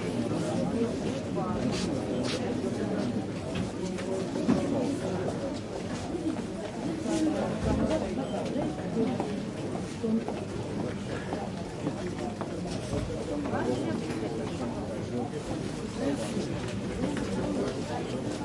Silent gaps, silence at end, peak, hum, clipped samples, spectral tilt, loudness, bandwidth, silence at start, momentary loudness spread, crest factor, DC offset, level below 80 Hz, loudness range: none; 0 s; -12 dBFS; none; under 0.1%; -6 dB/octave; -32 LUFS; 11.5 kHz; 0 s; 6 LU; 18 dB; under 0.1%; -50 dBFS; 3 LU